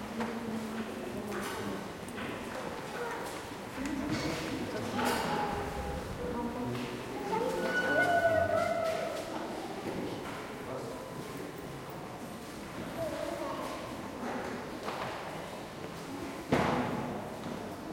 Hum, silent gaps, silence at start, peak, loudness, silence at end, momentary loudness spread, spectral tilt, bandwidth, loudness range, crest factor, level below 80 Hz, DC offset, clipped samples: none; none; 0 s; -14 dBFS; -36 LUFS; 0 s; 12 LU; -5 dB/octave; 16.5 kHz; 8 LU; 20 dB; -56 dBFS; under 0.1%; under 0.1%